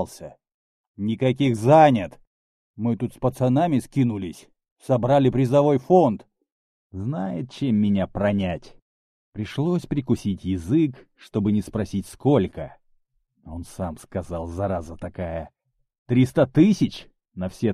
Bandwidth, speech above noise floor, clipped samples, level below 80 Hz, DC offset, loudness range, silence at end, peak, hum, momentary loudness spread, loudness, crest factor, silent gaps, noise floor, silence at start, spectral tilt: 13.5 kHz; 45 dB; under 0.1%; -48 dBFS; under 0.1%; 7 LU; 0 s; -4 dBFS; none; 18 LU; -22 LUFS; 20 dB; 0.54-0.94 s, 2.27-2.74 s, 4.71-4.76 s, 6.52-6.90 s, 8.82-9.32 s, 15.98-16.06 s; -67 dBFS; 0 s; -8 dB/octave